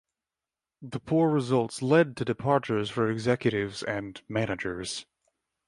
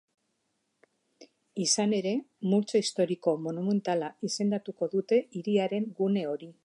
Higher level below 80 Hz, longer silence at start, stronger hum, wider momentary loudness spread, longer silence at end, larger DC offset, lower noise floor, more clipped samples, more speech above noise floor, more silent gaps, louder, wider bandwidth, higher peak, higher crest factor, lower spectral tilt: first, -60 dBFS vs -82 dBFS; second, 0.8 s vs 1.2 s; neither; first, 11 LU vs 6 LU; first, 0.65 s vs 0.1 s; neither; first, under -90 dBFS vs -78 dBFS; neither; first, over 63 dB vs 49 dB; neither; about the same, -28 LUFS vs -29 LUFS; about the same, 11.5 kHz vs 11.5 kHz; first, -8 dBFS vs -12 dBFS; about the same, 20 dB vs 18 dB; first, -6 dB/octave vs -4.5 dB/octave